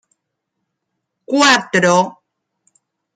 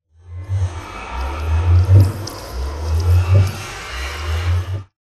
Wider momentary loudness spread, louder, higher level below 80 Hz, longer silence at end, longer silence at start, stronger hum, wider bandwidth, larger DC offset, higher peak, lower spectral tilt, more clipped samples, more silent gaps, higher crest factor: second, 9 LU vs 15 LU; first, -14 LUFS vs -19 LUFS; second, -64 dBFS vs -26 dBFS; first, 1.05 s vs 0.15 s; first, 1.3 s vs 0.25 s; neither; first, 14.5 kHz vs 13 kHz; neither; about the same, 0 dBFS vs 0 dBFS; second, -3 dB/octave vs -6 dB/octave; neither; neither; about the same, 18 dB vs 18 dB